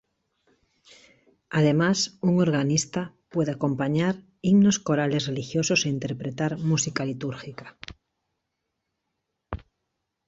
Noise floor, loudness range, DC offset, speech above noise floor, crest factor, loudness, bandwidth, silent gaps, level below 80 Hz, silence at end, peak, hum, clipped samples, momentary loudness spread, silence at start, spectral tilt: -81 dBFS; 8 LU; under 0.1%; 57 dB; 18 dB; -24 LUFS; 8.2 kHz; none; -56 dBFS; 0.7 s; -10 dBFS; none; under 0.1%; 19 LU; 1.5 s; -5 dB/octave